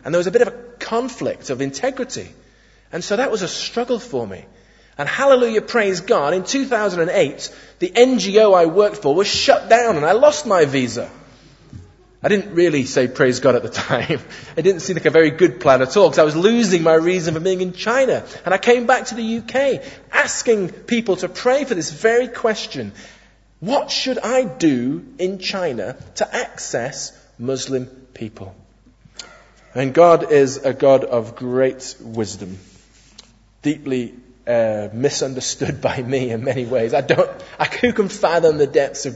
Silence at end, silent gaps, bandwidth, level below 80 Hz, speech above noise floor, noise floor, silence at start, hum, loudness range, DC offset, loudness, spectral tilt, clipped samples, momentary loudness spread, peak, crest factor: 0 s; none; 8 kHz; -54 dBFS; 33 dB; -50 dBFS; 0.05 s; none; 9 LU; under 0.1%; -18 LUFS; -4.5 dB/octave; under 0.1%; 14 LU; 0 dBFS; 18 dB